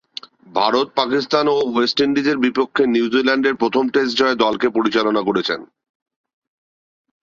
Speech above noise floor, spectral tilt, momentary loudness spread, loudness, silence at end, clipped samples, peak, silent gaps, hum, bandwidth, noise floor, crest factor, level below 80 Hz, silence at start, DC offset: 21 dB; -4.5 dB/octave; 4 LU; -18 LUFS; 1.75 s; under 0.1%; -2 dBFS; none; none; 7.4 kHz; -38 dBFS; 18 dB; -60 dBFS; 0.55 s; under 0.1%